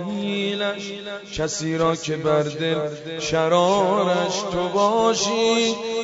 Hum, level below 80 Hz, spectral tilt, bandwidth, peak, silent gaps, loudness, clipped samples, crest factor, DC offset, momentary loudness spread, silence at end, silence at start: none; -52 dBFS; -4 dB/octave; 8 kHz; -6 dBFS; none; -21 LUFS; under 0.1%; 16 dB; under 0.1%; 9 LU; 0 s; 0 s